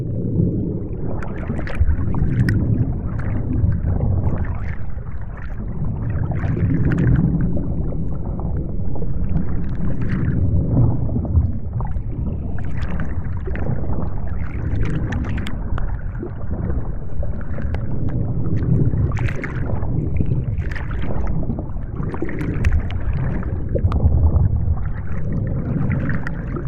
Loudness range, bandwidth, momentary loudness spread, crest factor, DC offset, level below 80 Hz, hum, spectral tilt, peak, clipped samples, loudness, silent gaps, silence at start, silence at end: 4 LU; 6.4 kHz; 9 LU; 14 dB; under 0.1%; -26 dBFS; none; -10 dB/octave; -4 dBFS; under 0.1%; -23 LUFS; none; 0 s; 0 s